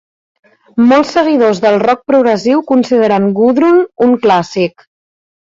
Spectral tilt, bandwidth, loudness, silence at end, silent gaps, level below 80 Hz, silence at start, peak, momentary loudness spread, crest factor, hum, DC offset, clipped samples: -6.5 dB/octave; 7.6 kHz; -11 LUFS; 0.7 s; none; -54 dBFS; 0.75 s; -2 dBFS; 3 LU; 10 dB; none; under 0.1%; under 0.1%